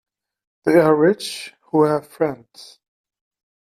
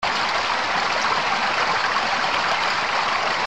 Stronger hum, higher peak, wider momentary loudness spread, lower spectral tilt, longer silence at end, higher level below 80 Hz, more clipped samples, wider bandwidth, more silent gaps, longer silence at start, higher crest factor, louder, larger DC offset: neither; first, -2 dBFS vs -8 dBFS; first, 14 LU vs 1 LU; first, -6 dB/octave vs -1.5 dB/octave; first, 1 s vs 0 s; second, -64 dBFS vs -54 dBFS; neither; first, 14.5 kHz vs 12.5 kHz; neither; first, 0.65 s vs 0 s; about the same, 18 dB vs 14 dB; about the same, -19 LUFS vs -20 LUFS; second, under 0.1% vs 0.7%